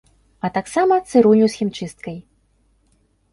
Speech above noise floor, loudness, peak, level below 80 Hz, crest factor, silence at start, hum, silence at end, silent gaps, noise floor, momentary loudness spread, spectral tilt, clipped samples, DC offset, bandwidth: 44 dB; -17 LUFS; -2 dBFS; -56 dBFS; 18 dB; 0.45 s; none; 1.15 s; none; -61 dBFS; 19 LU; -6 dB/octave; under 0.1%; under 0.1%; 11.5 kHz